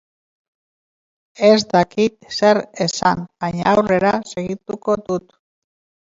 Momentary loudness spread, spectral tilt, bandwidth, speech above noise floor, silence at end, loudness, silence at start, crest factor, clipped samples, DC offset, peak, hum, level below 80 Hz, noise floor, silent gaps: 11 LU; -5 dB/octave; 7.8 kHz; over 73 dB; 0.95 s; -18 LUFS; 1.4 s; 18 dB; under 0.1%; under 0.1%; 0 dBFS; none; -54 dBFS; under -90 dBFS; none